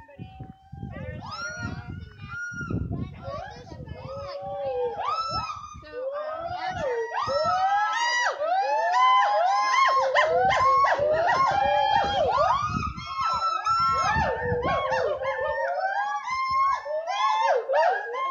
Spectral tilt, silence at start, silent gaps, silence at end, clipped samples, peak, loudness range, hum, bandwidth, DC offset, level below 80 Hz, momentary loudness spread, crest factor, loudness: -4 dB/octave; 0 s; none; 0 s; under 0.1%; -8 dBFS; 13 LU; none; 9.6 kHz; under 0.1%; -50 dBFS; 17 LU; 18 dB; -24 LUFS